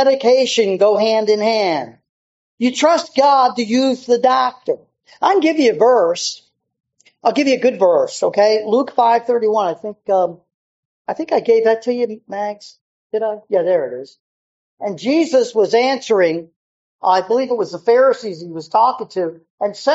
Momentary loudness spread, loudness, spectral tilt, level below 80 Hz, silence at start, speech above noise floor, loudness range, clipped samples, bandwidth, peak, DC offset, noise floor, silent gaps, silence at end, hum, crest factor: 12 LU; -16 LUFS; -2.5 dB/octave; -72 dBFS; 0 s; over 75 dB; 4 LU; under 0.1%; 8 kHz; 0 dBFS; under 0.1%; under -90 dBFS; 2.09-2.58 s, 10.54-11.05 s, 12.81-13.10 s, 14.20-14.78 s, 16.56-16.99 s, 19.50-19.58 s; 0 s; none; 16 dB